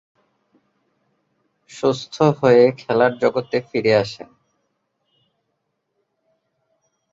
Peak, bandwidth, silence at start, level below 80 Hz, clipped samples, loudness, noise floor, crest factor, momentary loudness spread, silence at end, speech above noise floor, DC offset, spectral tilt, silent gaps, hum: -2 dBFS; 7.8 kHz; 1.75 s; -62 dBFS; under 0.1%; -18 LUFS; -74 dBFS; 20 dB; 10 LU; 2.95 s; 56 dB; under 0.1%; -6.5 dB/octave; none; none